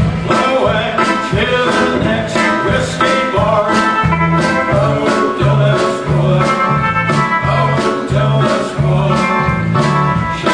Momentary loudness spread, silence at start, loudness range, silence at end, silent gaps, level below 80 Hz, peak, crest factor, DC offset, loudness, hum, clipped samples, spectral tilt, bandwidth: 3 LU; 0 s; 1 LU; 0 s; none; -32 dBFS; 0 dBFS; 12 dB; under 0.1%; -13 LUFS; none; under 0.1%; -6 dB/octave; 10 kHz